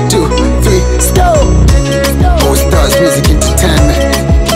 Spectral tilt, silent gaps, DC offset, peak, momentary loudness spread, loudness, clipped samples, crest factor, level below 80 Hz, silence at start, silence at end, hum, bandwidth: -5 dB/octave; none; under 0.1%; 0 dBFS; 2 LU; -9 LUFS; 0.5%; 8 dB; -12 dBFS; 0 s; 0 s; none; 16.5 kHz